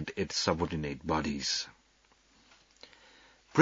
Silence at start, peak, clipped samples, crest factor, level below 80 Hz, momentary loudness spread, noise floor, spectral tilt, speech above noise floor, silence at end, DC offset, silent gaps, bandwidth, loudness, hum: 0 s; -8 dBFS; under 0.1%; 26 dB; -56 dBFS; 24 LU; -67 dBFS; -4 dB/octave; 34 dB; 0 s; under 0.1%; none; 7.6 kHz; -33 LUFS; none